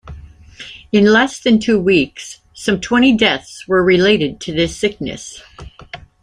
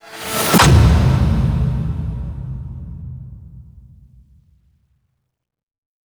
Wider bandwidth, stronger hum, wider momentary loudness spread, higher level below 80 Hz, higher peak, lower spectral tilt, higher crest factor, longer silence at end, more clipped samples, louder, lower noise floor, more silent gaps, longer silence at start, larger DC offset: second, 11.5 kHz vs over 20 kHz; neither; about the same, 22 LU vs 22 LU; second, -42 dBFS vs -24 dBFS; about the same, 0 dBFS vs 0 dBFS; about the same, -5 dB/octave vs -5 dB/octave; about the same, 16 dB vs 18 dB; second, 0.25 s vs 2.4 s; neither; about the same, -14 LUFS vs -15 LUFS; second, -37 dBFS vs -75 dBFS; neither; about the same, 0.05 s vs 0.05 s; neither